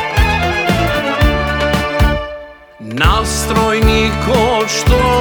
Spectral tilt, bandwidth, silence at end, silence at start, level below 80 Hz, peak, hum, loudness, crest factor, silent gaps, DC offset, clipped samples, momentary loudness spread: -4.5 dB/octave; over 20 kHz; 0 s; 0 s; -20 dBFS; 0 dBFS; none; -14 LUFS; 12 dB; none; under 0.1%; under 0.1%; 5 LU